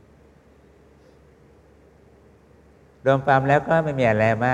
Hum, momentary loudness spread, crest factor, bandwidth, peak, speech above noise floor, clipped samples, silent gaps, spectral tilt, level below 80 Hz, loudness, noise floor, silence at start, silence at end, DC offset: none; 4 LU; 20 dB; 9.6 kHz; -4 dBFS; 34 dB; under 0.1%; none; -7.5 dB/octave; -54 dBFS; -20 LUFS; -53 dBFS; 3.05 s; 0 s; under 0.1%